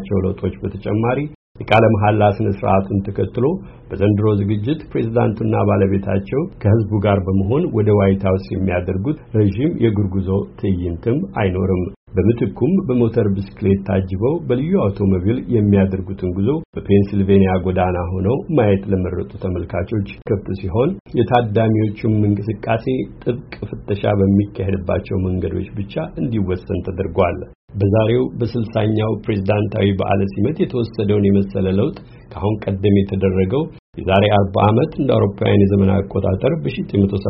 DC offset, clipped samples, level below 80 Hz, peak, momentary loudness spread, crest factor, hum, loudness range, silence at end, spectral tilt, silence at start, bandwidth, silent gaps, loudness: under 0.1%; under 0.1%; -40 dBFS; 0 dBFS; 8 LU; 18 dB; none; 3 LU; 0 s; -7.5 dB/octave; 0 s; 5.6 kHz; 1.35-1.55 s, 11.96-12.07 s, 16.65-16.73 s, 21.00-21.05 s, 27.55-27.68 s, 33.79-33.93 s; -18 LUFS